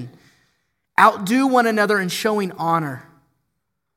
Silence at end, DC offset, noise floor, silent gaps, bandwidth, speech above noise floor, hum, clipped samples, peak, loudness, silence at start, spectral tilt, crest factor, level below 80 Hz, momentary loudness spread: 0.95 s; under 0.1%; -76 dBFS; none; 16.5 kHz; 58 dB; none; under 0.1%; 0 dBFS; -18 LUFS; 0 s; -5 dB/octave; 20 dB; -68 dBFS; 13 LU